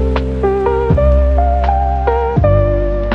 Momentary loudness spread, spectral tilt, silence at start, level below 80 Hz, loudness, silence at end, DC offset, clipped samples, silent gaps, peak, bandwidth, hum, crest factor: 4 LU; -9.5 dB/octave; 0 s; -16 dBFS; -14 LUFS; 0 s; under 0.1%; under 0.1%; none; 0 dBFS; 5 kHz; none; 12 dB